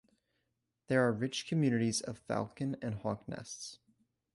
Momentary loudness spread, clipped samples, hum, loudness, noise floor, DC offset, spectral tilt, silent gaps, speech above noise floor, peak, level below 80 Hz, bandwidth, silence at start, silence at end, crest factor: 13 LU; under 0.1%; none; -35 LUFS; -84 dBFS; under 0.1%; -5 dB/octave; none; 49 dB; -16 dBFS; -68 dBFS; 11.5 kHz; 0.9 s; 0.6 s; 20 dB